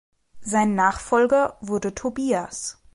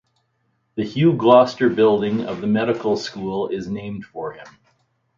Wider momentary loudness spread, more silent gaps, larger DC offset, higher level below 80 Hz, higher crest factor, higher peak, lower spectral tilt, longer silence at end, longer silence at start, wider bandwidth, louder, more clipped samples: second, 11 LU vs 18 LU; neither; neither; first, -50 dBFS vs -58 dBFS; about the same, 16 dB vs 20 dB; second, -6 dBFS vs 0 dBFS; second, -4.5 dB/octave vs -7 dB/octave; second, 0.2 s vs 0.7 s; second, 0.35 s vs 0.75 s; first, 11.5 kHz vs 7.6 kHz; second, -23 LUFS vs -19 LUFS; neither